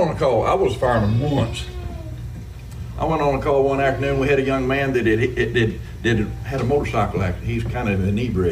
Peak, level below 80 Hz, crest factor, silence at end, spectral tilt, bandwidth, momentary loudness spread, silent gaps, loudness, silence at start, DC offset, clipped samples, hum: -6 dBFS; -34 dBFS; 14 dB; 0 s; -7 dB/octave; 15 kHz; 13 LU; none; -20 LUFS; 0 s; under 0.1%; under 0.1%; none